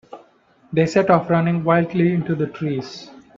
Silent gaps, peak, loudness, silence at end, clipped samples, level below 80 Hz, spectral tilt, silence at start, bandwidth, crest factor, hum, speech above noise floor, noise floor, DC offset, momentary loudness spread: none; 0 dBFS; -19 LUFS; 0.2 s; under 0.1%; -58 dBFS; -7.5 dB/octave; 0.1 s; 7.6 kHz; 20 dB; none; 36 dB; -55 dBFS; under 0.1%; 10 LU